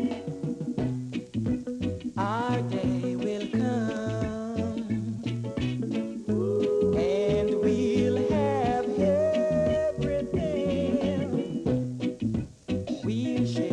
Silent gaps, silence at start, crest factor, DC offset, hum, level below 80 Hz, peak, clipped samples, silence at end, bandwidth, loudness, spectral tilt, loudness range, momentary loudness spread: none; 0 s; 16 dB; under 0.1%; none; -50 dBFS; -12 dBFS; under 0.1%; 0 s; 10.5 kHz; -28 LUFS; -7.5 dB/octave; 5 LU; 7 LU